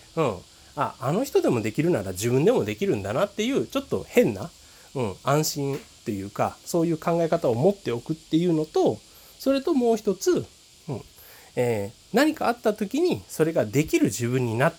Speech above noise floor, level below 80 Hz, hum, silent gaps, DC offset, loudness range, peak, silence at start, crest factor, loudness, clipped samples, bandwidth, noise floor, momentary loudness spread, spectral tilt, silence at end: 25 dB; -58 dBFS; none; none; under 0.1%; 2 LU; -4 dBFS; 0.15 s; 20 dB; -25 LUFS; under 0.1%; over 20 kHz; -49 dBFS; 11 LU; -5.5 dB/octave; 0 s